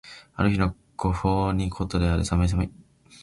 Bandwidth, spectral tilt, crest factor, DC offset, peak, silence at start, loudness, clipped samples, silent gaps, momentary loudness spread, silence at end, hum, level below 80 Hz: 11.5 kHz; -7 dB/octave; 16 dB; under 0.1%; -8 dBFS; 0.05 s; -25 LUFS; under 0.1%; none; 6 LU; 0.4 s; none; -34 dBFS